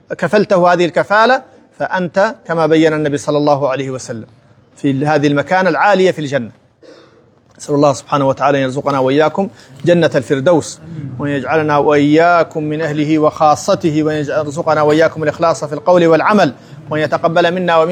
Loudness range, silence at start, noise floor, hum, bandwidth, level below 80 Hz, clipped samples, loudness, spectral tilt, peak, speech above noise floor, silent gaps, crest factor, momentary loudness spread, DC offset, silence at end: 3 LU; 0.1 s; -48 dBFS; none; 11 kHz; -58 dBFS; under 0.1%; -13 LUFS; -6 dB/octave; 0 dBFS; 35 dB; none; 14 dB; 10 LU; under 0.1%; 0 s